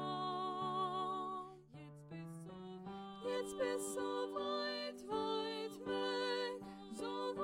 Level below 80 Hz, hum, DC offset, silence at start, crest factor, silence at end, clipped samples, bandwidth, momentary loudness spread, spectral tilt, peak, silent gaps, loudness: -76 dBFS; none; under 0.1%; 0 s; 14 dB; 0 s; under 0.1%; 16.5 kHz; 12 LU; -4 dB/octave; -28 dBFS; none; -42 LUFS